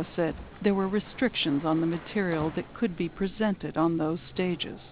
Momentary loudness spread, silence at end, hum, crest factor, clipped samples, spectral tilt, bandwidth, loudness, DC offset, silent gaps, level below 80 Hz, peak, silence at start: 5 LU; 0 s; none; 16 dB; under 0.1%; -5 dB/octave; 4 kHz; -29 LUFS; 0.1%; none; -52 dBFS; -12 dBFS; 0 s